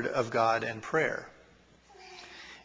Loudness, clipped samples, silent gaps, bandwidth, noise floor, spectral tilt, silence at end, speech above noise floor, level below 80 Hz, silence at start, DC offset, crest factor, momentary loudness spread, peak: -30 LUFS; under 0.1%; none; 8 kHz; -60 dBFS; -5 dB/octave; 0.05 s; 30 dB; -68 dBFS; 0 s; under 0.1%; 20 dB; 21 LU; -14 dBFS